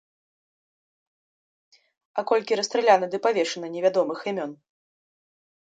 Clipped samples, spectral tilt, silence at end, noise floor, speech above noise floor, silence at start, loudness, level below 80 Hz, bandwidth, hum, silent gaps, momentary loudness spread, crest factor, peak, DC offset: under 0.1%; -3.5 dB/octave; 1.2 s; under -90 dBFS; over 67 dB; 2.15 s; -24 LUFS; -82 dBFS; 9.2 kHz; none; none; 12 LU; 22 dB; -4 dBFS; under 0.1%